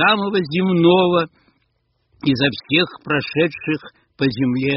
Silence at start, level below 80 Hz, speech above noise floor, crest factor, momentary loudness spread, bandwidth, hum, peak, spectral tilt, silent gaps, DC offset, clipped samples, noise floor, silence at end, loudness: 0 s; -54 dBFS; 49 dB; 16 dB; 10 LU; 5.8 kHz; none; -2 dBFS; -4 dB/octave; none; under 0.1%; under 0.1%; -67 dBFS; 0 s; -18 LUFS